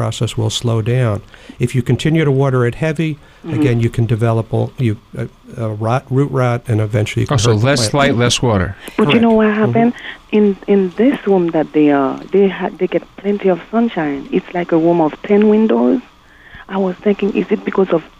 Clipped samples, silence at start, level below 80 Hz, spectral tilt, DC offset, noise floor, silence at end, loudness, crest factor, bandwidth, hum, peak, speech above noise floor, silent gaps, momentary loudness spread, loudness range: under 0.1%; 0 s; -42 dBFS; -6.5 dB/octave; under 0.1%; -40 dBFS; 0.1 s; -15 LUFS; 12 dB; 12.5 kHz; none; -2 dBFS; 26 dB; none; 8 LU; 4 LU